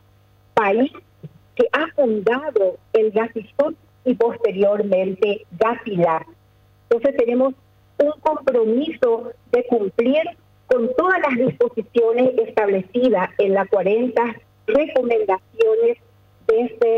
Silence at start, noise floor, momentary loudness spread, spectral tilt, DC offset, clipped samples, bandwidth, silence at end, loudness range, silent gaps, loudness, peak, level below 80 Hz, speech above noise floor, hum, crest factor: 0.55 s; -54 dBFS; 5 LU; -7.5 dB/octave; under 0.1%; under 0.1%; 6.2 kHz; 0 s; 2 LU; none; -19 LUFS; -8 dBFS; -60 dBFS; 35 dB; none; 12 dB